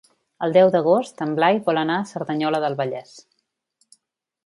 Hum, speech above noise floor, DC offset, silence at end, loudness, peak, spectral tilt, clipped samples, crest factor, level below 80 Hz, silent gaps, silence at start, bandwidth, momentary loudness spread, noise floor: none; 53 dB; under 0.1%; 1.25 s; -20 LUFS; -4 dBFS; -6.5 dB/octave; under 0.1%; 18 dB; -72 dBFS; none; 0.4 s; 11.5 kHz; 11 LU; -73 dBFS